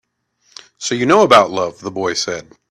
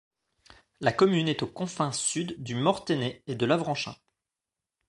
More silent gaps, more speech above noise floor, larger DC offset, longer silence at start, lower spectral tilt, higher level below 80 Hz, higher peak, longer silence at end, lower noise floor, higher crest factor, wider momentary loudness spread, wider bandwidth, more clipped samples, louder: neither; second, 47 dB vs 61 dB; neither; about the same, 0.8 s vs 0.8 s; about the same, -3.5 dB/octave vs -4.5 dB/octave; first, -56 dBFS vs -66 dBFS; first, 0 dBFS vs -8 dBFS; second, 0.3 s vs 0.95 s; second, -62 dBFS vs -89 dBFS; second, 16 dB vs 22 dB; first, 14 LU vs 10 LU; first, 14 kHz vs 11.5 kHz; neither; first, -15 LUFS vs -28 LUFS